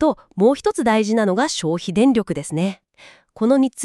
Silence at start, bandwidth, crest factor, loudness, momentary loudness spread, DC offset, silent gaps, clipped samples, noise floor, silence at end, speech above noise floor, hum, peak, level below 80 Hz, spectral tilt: 0 s; 12 kHz; 16 dB; -19 LUFS; 7 LU; under 0.1%; none; under 0.1%; -49 dBFS; 0 s; 31 dB; none; -4 dBFS; -54 dBFS; -5.5 dB/octave